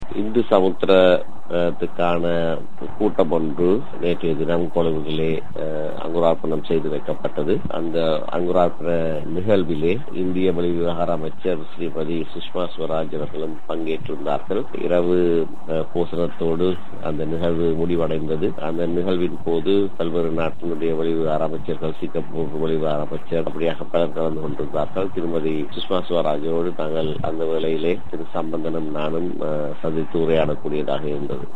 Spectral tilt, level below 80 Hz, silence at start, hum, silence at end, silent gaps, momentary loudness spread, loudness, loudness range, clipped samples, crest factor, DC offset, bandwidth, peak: -8.5 dB/octave; -52 dBFS; 0 s; none; 0 s; none; 7 LU; -23 LUFS; 3 LU; under 0.1%; 22 dB; 10%; 9 kHz; 0 dBFS